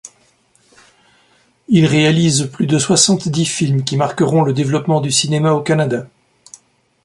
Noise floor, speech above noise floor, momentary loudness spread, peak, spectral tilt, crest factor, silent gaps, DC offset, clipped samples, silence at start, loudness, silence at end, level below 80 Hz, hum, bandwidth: -56 dBFS; 41 dB; 6 LU; 0 dBFS; -4.5 dB/octave; 16 dB; none; under 0.1%; under 0.1%; 0.05 s; -14 LUFS; 1 s; -54 dBFS; none; 11.5 kHz